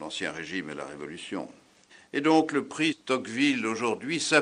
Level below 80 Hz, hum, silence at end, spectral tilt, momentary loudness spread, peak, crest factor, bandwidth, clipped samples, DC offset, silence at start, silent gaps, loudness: -72 dBFS; none; 0 s; -3.5 dB/octave; 14 LU; -6 dBFS; 22 dB; 10.5 kHz; under 0.1%; under 0.1%; 0 s; none; -28 LUFS